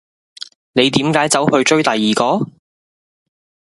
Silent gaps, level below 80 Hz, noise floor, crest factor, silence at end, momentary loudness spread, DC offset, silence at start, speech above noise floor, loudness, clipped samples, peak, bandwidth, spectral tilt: none; -56 dBFS; under -90 dBFS; 18 dB; 1.3 s; 18 LU; under 0.1%; 0.75 s; over 76 dB; -14 LUFS; under 0.1%; 0 dBFS; 11.5 kHz; -4 dB/octave